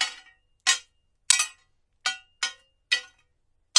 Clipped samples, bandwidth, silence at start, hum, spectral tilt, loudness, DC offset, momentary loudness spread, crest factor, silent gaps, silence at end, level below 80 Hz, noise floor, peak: under 0.1%; 11.5 kHz; 0 s; none; 5 dB/octave; -26 LUFS; under 0.1%; 10 LU; 28 dB; none; 0 s; -72 dBFS; -70 dBFS; -2 dBFS